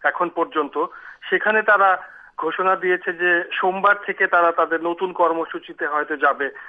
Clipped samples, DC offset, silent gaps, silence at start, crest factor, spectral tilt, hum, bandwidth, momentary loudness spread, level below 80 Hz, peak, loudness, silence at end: under 0.1%; under 0.1%; none; 0 s; 16 dB; -6.5 dB/octave; none; 5 kHz; 10 LU; -70 dBFS; -4 dBFS; -20 LUFS; 0 s